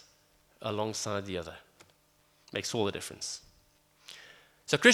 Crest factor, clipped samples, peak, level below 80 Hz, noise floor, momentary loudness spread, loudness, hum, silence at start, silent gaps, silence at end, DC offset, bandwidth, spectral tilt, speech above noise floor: 28 dB; under 0.1%; -6 dBFS; -68 dBFS; -67 dBFS; 18 LU; -33 LUFS; none; 0.6 s; none; 0 s; under 0.1%; 16.5 kHz; -3 dB/octave; 32 dB